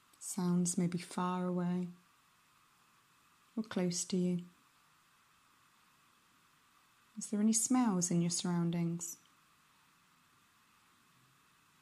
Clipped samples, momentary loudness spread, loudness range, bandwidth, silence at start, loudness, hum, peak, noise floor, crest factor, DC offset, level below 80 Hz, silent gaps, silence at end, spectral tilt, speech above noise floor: under 0.1%; 14 LU; 8 LU; 13.5 kHz; 0.2 s; -35 LUFS; none; -20 dBFS; -69 dBFS; 18 dB; under 0.1%; -84 dBFS; none; 2.65 s; -5 dB/octave; 35 dB